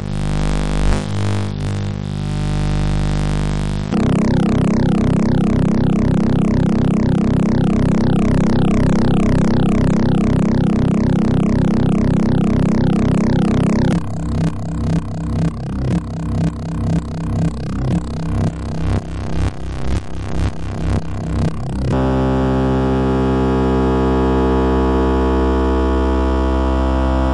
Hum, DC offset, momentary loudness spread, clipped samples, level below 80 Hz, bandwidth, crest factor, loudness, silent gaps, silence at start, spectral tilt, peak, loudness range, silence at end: none; under 0.1%; 7 LU; under 0.1%; -24 dBFS; 11 kHz; 10 dB; -17 LUFS; none; 0 s; -8 dB/octave; -4 dBFS; 6 LU; 0 s